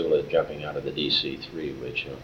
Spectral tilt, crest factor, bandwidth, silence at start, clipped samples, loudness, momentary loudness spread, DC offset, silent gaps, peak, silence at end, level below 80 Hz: -5.5 dB/octave; 18 dB; 8 kHz; 0 s; under 0.1%; -27 LUFS; 10 LU; under 0.1%; none; -10 dBFS; 0 s; -54 dBFS